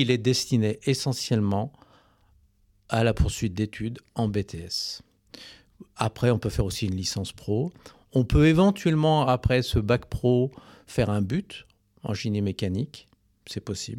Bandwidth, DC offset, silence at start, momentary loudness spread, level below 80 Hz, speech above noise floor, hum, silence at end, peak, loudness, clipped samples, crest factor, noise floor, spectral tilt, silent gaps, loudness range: 16.5 kHz; under 0.1%; 0 s; 13 LU; -40 dBFS; 38 dB; none; 0 s; -8 dBFS; -26 LUFS; under 0.1%; 16 dB; -63 dBFS; -6 dB/octave; none; 7 LU